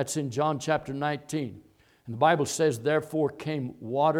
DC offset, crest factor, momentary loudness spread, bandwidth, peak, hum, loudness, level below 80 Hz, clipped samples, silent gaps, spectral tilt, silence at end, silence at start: under 0.1%; 18 dB; 10 LU; 17 kHz; -8 dBFS; none; -28 LUFS; -66 dBFS; under 0.1%; none; -5 dB/octave; 0 s; 0 s